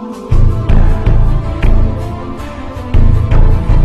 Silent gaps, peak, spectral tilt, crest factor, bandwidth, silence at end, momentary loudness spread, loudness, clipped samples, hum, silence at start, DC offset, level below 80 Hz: none; 0 dBFS; -8.5 dB/octave; 8 dB; 4.7 kHz; 0 s; 12 LU; -14 LUFS; under 0.1%; none; 0 s; under 0.1%; -10 dBFS